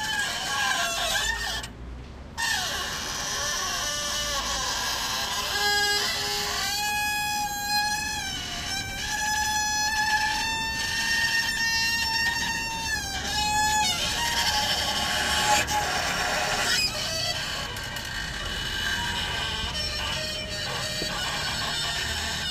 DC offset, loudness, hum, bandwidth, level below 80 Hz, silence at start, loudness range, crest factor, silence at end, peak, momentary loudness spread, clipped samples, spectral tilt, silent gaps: under 0.1%; -25 LUFS; none; 15.5 kHz; -44 dBFS; 0 s; 4 LU; 18 dB; 0 s; -8 dBFS; 7 LU; under 0.1%; -1 dB/octave; none